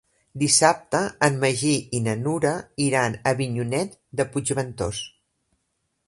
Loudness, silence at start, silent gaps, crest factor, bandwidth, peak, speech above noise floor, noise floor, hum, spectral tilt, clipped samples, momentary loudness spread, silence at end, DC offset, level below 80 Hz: -23 LUFS; 0.35 s; none; 22 dB; 11.5 kHz; -2 dBFS; 52 dB; -75 dBFS; none; -4 dB/octave; under 0.1%; 11 LU; 1 s; under 0.1%; -54 dBFS